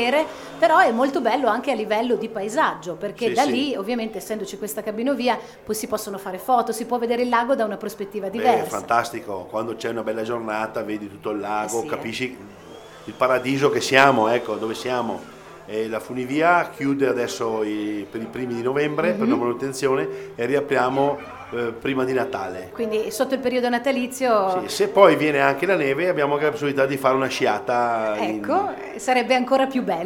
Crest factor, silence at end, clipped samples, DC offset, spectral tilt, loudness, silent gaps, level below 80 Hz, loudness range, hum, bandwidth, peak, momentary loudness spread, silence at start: 22 dB; 0 s; under 0.1%; under 0.1%; -4.5 dB/octave; -22 LUFS; none; -60 dBFS; 6 LU; none; 18.5 kHz; 0 dBFS; 11 LU; 0 s